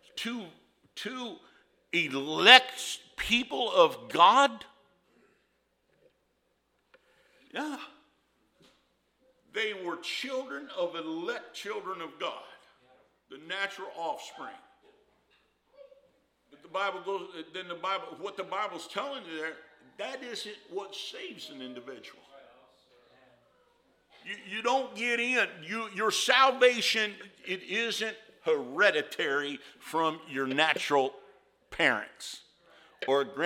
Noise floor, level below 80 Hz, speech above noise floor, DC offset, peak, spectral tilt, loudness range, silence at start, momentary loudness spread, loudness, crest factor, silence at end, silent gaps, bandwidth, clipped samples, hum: -75 dBFS; -68 dBFS; 45 dB; under 0.1%; 0 dBFS; -2 dB/octave; 20 LU; 0.15 s; 19 LU; -28 LUFS; 32 dB; 0 s; none; 16.5 kHz; under 0.1%; none